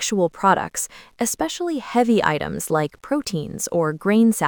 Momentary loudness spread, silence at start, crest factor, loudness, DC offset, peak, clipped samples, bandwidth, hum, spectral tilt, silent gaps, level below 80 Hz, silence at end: 9 LU; 0 s; 20 dB; -21 LUFS; under 0.1%; -2 dBFS; under 0.1%; 19.5 kHz; none; -4.5 dB/octave; none; -52 dBFS; 0 s